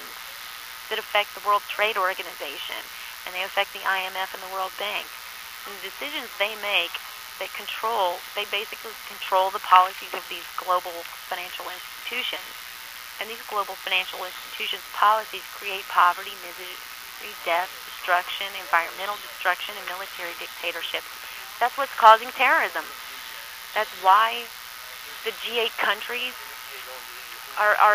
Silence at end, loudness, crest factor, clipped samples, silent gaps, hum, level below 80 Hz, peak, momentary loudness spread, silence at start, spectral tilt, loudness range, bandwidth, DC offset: 0 s; -25 LUFS; 26 dB; under 0.1%; none; none; -68 dBFS; 0 dBFS; 16 LU; 0 s; 0 dB/octave; 7 LU; 15.5 kHz; under 0.1%